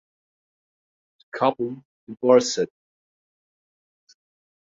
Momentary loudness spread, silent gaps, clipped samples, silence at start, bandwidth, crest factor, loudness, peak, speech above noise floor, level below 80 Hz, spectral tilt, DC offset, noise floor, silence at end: 21 LU; 1.85-2.07 s; under 0.1%; 1.35 s; 7.8 kHz; 24 dB; -22 LUFS; -4 dBFS; over 69 dB; -72 dBFS; -4 dB/octave; under 0.1%; under -90 dBFS; 2.05 s